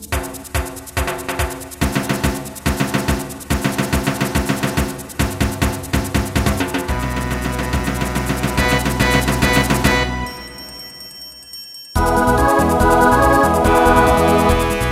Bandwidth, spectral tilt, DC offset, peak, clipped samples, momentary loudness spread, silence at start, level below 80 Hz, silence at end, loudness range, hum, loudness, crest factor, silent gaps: 16 kHz; -5 dB/octave; under 0.1%; 0 dBFS; under 0.1%; 12 LU; 0 s; -26 dBFS; 0 s; 6 LU; none; -17 LUFS; 18 dB; none